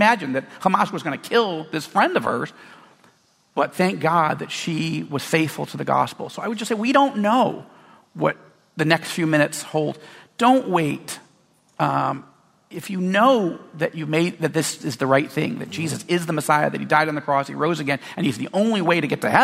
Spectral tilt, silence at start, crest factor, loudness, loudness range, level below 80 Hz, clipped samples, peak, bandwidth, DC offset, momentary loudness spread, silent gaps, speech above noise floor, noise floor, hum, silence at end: -5 dB/octave; 0 s; 20 dB; -21 LUFS; 2 LU; -66 dBFS; under 0.1%; -2 dBFS; 16 kHz; under 0.1%; 10 LU; none; 38 dB; -59 dBFS; none; 0 s